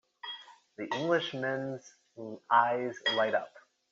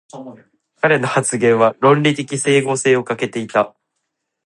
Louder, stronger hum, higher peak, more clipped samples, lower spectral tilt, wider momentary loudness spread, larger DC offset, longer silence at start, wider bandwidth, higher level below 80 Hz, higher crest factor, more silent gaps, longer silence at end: second, -30 LUFS vs -16 LUFS; neither; second, -12 dBFS vs 0 dBFS; neither; second, -2 dB/octave vs -4.5 dB/octave; first, 19 LU vs 9 LU; neither; about the same, 0.25 s vs 0.15 s; second, 7.6 kHz vs 11.5 kHz; second, -82 dBFS vs -66 dBFS; first, 22 dB vs 16 dB; neither; second, 0.3 s vs 0.75 s